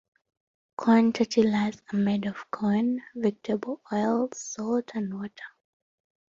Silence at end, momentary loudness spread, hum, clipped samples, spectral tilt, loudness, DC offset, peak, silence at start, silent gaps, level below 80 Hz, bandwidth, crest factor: 0.8 s; 12 LU; none; under 0.1%; -6 dB/octave; -27 LUFS; under 0.1%; -8 dBFS; 0.8 s; none; -68 dBFS; 7.6 kHz; 20 dB